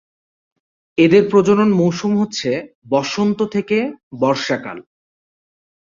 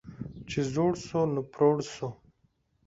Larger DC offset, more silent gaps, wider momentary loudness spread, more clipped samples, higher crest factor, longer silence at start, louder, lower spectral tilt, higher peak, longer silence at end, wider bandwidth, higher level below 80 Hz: neither; first, 2.75-2.82 s, 4.03-4.11 s vs none; about the same, 13 LU vs 14 LU; neither; about the same, 16 dB vs 18 dB; first, 0.95 s vs 0.05 s; first, -17 LUFS vs -29 LUFS; about the same, -6 dB/octave vs -6.5 dB/octave; first, -2 dBFS vs -12 dBFS; first, 1.05 s vs 0.7 s; about the same, 7.6 kHz vs 7.8 kHz; about the same, -58 dBFS vs -58 dBFS